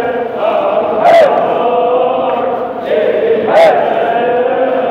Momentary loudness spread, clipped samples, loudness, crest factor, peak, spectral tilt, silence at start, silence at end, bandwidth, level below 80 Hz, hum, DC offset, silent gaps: 7 LU; under 0.1%; -11 LUFS; 10 dB; 0 dBFS; -5.5 dB/octave; 0 s; 0 s; 10 kHz; -56 dBFS; none; under 0.1%; none